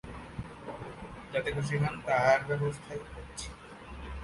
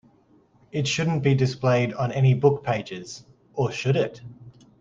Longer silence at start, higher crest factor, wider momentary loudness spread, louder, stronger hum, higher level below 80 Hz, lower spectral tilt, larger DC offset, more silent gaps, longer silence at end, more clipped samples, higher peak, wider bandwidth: second, 0.05 s vs 0.75 s; about the same, 22 dB vs 20 dB; about the same, 18 LU vs 16 LU; second, -32 LUFS vs -23 LUFS; neither; first, -50 dBFS vs -58 dBFS; about the same, -5.5 dB/octave vs -6 dB/octave; neither; neither; second, 0 s vs 0.3 s; neither; second, -10 dBFS vs -6 dBFS; first, 11.5 kHz vs 7.8 kHz